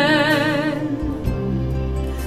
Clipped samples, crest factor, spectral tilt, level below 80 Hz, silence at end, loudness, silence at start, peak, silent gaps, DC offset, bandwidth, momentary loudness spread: under 0.1%; 16 dB; -6 dB/octave; -30 dBFS; 0 s; -21 LUFS; 0 s; -4 dBFS; none; 0.1%; 15 kHz; 8 LU